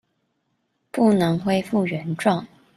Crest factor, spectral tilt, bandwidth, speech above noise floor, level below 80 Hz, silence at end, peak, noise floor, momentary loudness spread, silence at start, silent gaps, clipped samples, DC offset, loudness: 18 dB; -7 dB/octave; 13.5 kHz; 52 dB; -60 dBFS; 0.3 s; -6 dBFS; -72 dBFS; 8 LU; 0.95 s; none; under 0.1%; under 0.1%; -22 LUFS